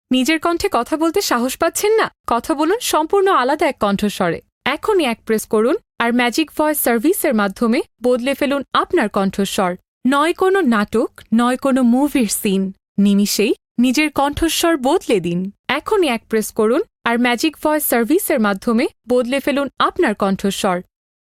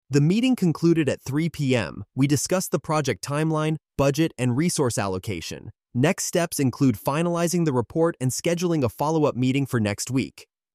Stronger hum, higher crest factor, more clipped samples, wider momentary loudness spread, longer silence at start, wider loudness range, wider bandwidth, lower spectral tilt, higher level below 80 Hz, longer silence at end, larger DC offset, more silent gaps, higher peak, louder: neither; about the same, 16 dB vs 14 dB; neither; about the same, 5 LU vs 6 LU; about the same, 0.1 s vs 0.1 s; about the same, 1 LU vs 1 LU; about the same, 16.5 kHz vs 15.5 kHz; second, -4 dB/octave vs -5.5 dB/octave; first, -46 dBFS vs -54 dBFS; first, 0.55 s vs 0.35 s; neither; first, 2.20-2.24 s, 4.52-4.61 s, 9.88-10.01 s, 12.88-12.95 s, 13.71-13.75 s, 15.59-15.64 s vs none; first, 0 dBFS vs -8 dBFS; first, -17 LUFS vs -23 LUFS